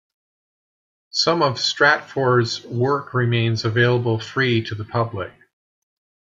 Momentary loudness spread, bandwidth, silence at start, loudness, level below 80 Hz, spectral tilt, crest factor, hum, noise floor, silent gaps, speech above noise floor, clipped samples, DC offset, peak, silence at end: 9 LU; 7.6 kHz; 1.15 s; -20 LUFS; -62 dBFS; -5 dB/octave; 20 dB; none; under -90 dBFS; none; over 70 dB; under 0.1%; under 0.1%; -2 dBFS; 1.05 s